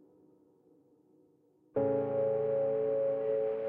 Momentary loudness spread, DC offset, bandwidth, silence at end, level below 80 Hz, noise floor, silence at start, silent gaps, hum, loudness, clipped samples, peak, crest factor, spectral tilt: 2 LU; under 0.1%; 3.4 kHz; 0 s; -76 dBFS; -67 dBFS; 1.75 s; none; none; -32 LUFS; under 0.1%; -20 dBFS; 14 dB; -8.5 dB/octave